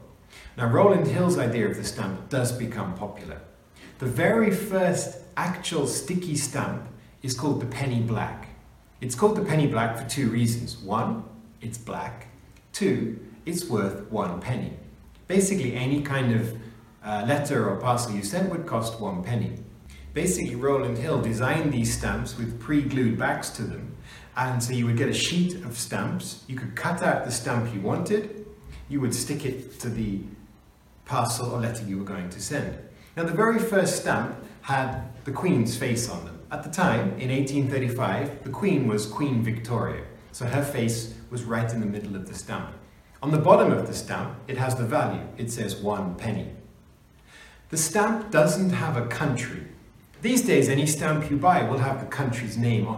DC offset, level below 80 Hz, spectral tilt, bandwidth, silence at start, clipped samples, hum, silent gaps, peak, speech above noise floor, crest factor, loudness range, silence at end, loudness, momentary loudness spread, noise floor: under 0.1%; -50 dBFS; -5.5 dB/octave; 16.5 kHz; 0 s; under 0.1%; none; none; -2 dBFS; 29 dB; 24 dB; 5 LU; 0 s; -26 LUFS; 13 LU; -54 dBFS